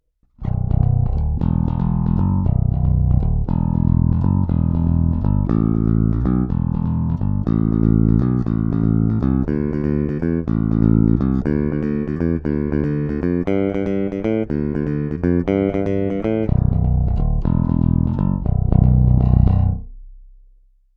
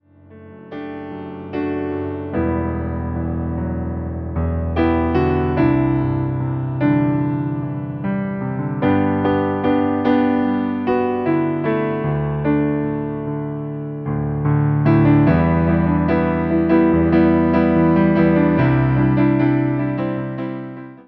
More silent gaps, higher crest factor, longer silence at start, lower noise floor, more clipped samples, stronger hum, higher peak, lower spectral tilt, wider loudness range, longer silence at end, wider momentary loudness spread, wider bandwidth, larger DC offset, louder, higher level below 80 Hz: neither; about the same, 16 dB vs 16 dB; about the same, 0.4 s vs 0.3 s; first, -52 dBFS vs -42 dBFS; neither; neither; about the same, -2 dBFS vs -2 dBFS; about the same, -12 dB/octave vs -11.5 dB/octave; second, 3 LU vs 8 LU; first, 0.75 s vs 0.05 s; second, 6 LU vs 11 LU; second, 3.9 kHz vs 5.2 kHz; neither; about the same, -19 LUFS vs -18 LUFS; first, -24 dBFS vs -36 dBFS